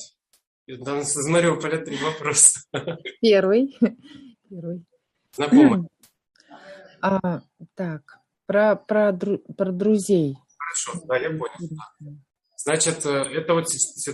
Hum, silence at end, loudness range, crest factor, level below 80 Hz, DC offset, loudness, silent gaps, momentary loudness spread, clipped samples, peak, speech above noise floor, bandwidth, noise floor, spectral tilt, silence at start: none; 0 s; 6 LU; 22 dB; -66 dBFS; under 0.1%; -21 LUFS; 0.47-0.66 s; 20 LU; under 0.1%; 0 dBFS; 23 dB; 12.5 kHz; -45 dBFS; -4 dB/octave; 0 s